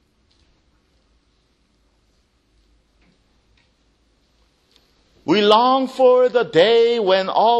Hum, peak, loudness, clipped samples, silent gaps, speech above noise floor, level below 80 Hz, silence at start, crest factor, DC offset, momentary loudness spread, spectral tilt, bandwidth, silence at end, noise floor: none; 0 dBFS; -15 LUFS; under 0.1%; none; 48 dB; -62 dBFS; 5.25 s; 20 dB; under 0.1%; 4 LU; -5 dB/octave; 8.6 kHz; 0 s; -62 dBFS